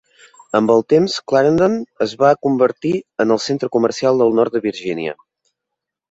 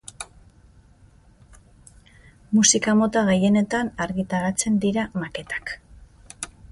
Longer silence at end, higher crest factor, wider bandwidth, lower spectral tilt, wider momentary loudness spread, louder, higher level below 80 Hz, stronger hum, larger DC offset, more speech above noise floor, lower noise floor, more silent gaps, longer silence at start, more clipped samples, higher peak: first, 1 s vs 0.25 s; second, 16 dB vs 22 dB; second, 8 kHz vs 11.5 kHz; first, -6 dB/octave vs -4 dB/octave; second, 9 LU vs 19 LU; first, -17 LUFS vs -21 LUFS; second, -58 dBFS vs -50 dBFS; neither; neither; first, 66 dB vs 32 dB; first, -81 dBFS vs -53 dBFS; neither; first, 0.55 s vs 0.2 s; neither; about the same, -2 dBFS vs -2 dBFS